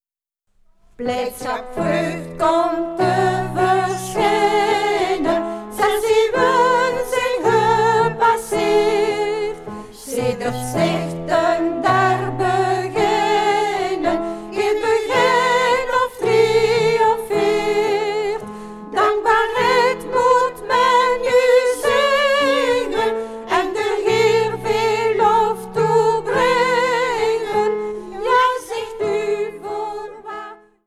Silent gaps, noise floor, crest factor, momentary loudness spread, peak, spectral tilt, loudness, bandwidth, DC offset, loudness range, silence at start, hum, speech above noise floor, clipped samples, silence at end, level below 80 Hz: none; -75 dBFS; 14 dB; 10 LU; -4 dBFS; -4.5 dB/octave; -18 LUFS; 14.5 kHz; under 0.1%; 4 LU; 1 s; none; 56 dB; under 0.1%; 0.3 s; -46 dBFS